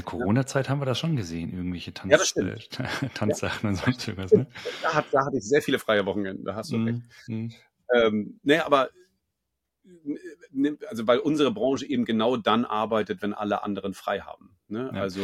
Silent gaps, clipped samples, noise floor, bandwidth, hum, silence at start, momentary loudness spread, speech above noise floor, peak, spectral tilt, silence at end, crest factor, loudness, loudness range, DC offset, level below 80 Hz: none; under 0.1%; -82 dBFS; 14.5 kHz; none; 0 s; 12 LU; 56 dB; -4 dBFS; -5 dB/octave; 0 s; 24 dB; -26 LUFS; 2 LU; under 0.1%; -60 dBFS